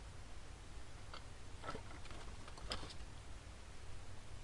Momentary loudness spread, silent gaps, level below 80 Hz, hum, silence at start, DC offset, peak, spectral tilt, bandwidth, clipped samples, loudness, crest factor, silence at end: 9 LU; none; -56 dBFS; none; 0 s; under 0.1%; -24 dBFS; -4 dB/octave; 11.5 kHz; under 0.1%; -53 LUFS; 24 dB; 0 s